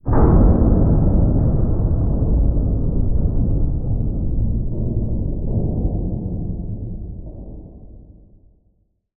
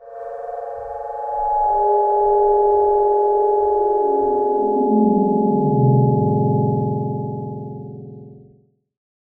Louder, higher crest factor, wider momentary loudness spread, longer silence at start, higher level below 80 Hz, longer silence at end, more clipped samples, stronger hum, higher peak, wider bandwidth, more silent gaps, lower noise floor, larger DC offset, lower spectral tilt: about the same, -20 LUFS vs -18 LUFS; about the same, 16 dB vs 14 dB; about the same, 15 LU vs 14 LU; about the same, 0.05 s vs 0 s; first, -20 dBFS vs -46 dBFS; first, 1.15 s vs 0.85 s; neither; neither; about the same, -2 dBFS vs -4 dBFS; about the same, 2 kHz vs 1.9 kHz; neither; first, -62 dBFS vs -55 dBFS; neither; first, -15.5 dB/octave vs -13 dB/octave